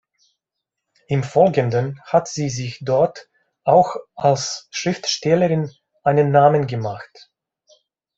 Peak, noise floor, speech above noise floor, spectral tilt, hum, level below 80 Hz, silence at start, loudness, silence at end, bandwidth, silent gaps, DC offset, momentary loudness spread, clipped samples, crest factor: 0 dBFS; -82 dBFS; 64 dB; -5.5 dB/octave; none; -60 dBFS; 1.1 s; -19 LUFS; 1.15 s; 8 kHz; none; under 0.1%; 10 LU; under 0.1%; 20 dB